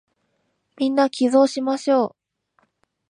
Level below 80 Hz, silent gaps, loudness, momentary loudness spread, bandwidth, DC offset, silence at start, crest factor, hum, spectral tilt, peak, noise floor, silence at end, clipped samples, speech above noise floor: -80 dBFS; none; -20 LUFS; 7 LU; 10.5 kHz; under 0.1%; 0.8 s; 16 dB; none; -4 dB/octave; -6 dBFS; -71 dBFS; 1 s; under 0.1%; 52 dB